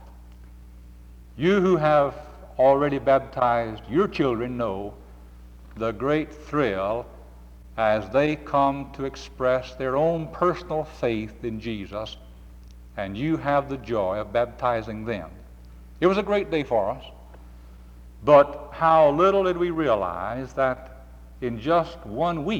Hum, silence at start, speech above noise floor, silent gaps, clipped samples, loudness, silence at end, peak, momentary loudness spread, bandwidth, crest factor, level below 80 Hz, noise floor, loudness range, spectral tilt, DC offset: 60 Hz at -45 dBFS; 0 s; 22 dB; none; under 0.1%; -24 LUFS; 0 s; -6 dBFS; 14 LU; 9 kHz; 18 dB; -46 dBFS; -45 dBFS; 7 LU; -7 dB/octave; under 0.1%